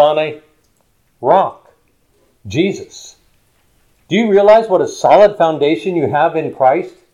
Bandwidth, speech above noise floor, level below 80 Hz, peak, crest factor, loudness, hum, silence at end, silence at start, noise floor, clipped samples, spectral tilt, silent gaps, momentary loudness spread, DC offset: 10.5 kHz; 47 dB; -56 dBFS; 0 dBFS; 14 dB; -13 LUFS; none; 0.25 s; 0 s; -59 dBFS; under 0.1%; -6 dB/octave; none; 13 LU; under 0.1%